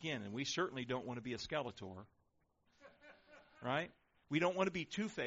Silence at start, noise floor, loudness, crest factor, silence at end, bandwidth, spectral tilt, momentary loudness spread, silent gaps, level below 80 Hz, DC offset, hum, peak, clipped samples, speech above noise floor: 0 s; -78 dBFS; -41 LUFS; 20 dB; 0 s; 7.6 kHz; -3.5 dB/octave; 16 LU; none; -74 dBFS; under 0.1%; none; -22 dBFS; under 0.1%; 38 dB